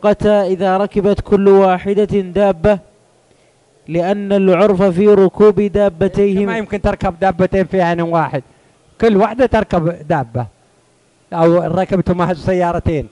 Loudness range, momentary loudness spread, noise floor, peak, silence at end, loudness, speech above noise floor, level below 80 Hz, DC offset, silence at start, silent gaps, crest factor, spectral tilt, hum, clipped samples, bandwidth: 4 LU; 8 LU; -54 dBFS; -2 dBFS; 0.05 s; -14 LUFS; 41 dB; -36 dBFS; under 0.1%; 0 s; none; 12 dB; -8 dB/octave; none; under 0.1%; 10.5 kHz